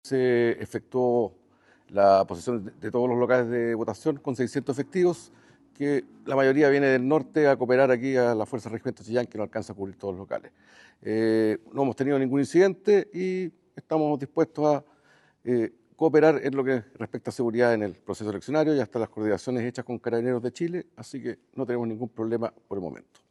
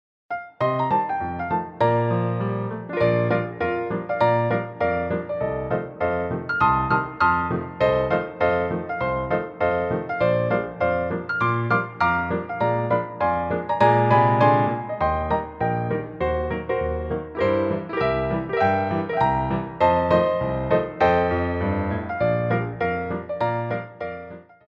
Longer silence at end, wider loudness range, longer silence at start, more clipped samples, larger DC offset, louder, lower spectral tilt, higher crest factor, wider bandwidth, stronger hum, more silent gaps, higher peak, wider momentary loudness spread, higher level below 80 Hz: about the same, 0.35 s vs 0.25 s; first, 7 LU vs 3 LU; second, 0.05 s vs 0.3 s; neither; neither; second, -26 LUFS vs -23 LUFS; second, -7 dB/octave vs -9 dB/octave; about the same, 20 dB vs 18 dB; first, 12 kHz vs 6.2 kHz; neither; neither; about the same, -6 dBFS vs -4 dBFS; first, 14 LU vs 8 LU; second, -72 dBFS vs -44 dBFS